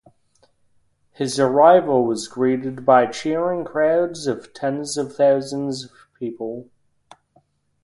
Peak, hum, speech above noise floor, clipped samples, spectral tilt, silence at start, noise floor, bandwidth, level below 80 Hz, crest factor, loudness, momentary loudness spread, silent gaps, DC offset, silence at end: -2 dBFS; none; 42 dB; under 0.1%; -5 dB/octave; 1.2 s; -61 dBFS; 11.5 kHz; -64 dBFS; 20 dB; -19 LUFS; 17 LU; none; under 0.1%; 1.2 s